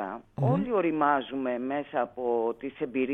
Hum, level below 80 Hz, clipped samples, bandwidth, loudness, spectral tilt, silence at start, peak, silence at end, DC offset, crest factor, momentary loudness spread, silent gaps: none; -62 dBFS; under 0.1%; 4.1 kHz; -29 LUFS; -10 dB/octave; 0 s; -12 dBFS; 0 s; under 0.1%; 18 dB; 7 LU; none